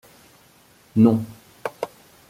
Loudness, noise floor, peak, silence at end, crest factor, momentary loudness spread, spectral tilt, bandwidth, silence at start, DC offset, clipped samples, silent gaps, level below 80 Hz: -21 LUFS; -54 dBFS; -4 dBFS; 0.45 s; 20 dB; 17 LU; -8.5 dB/octave; 15 kHz; 0.95 s; under 0.1%; under 0.1%; none; -62 dBFS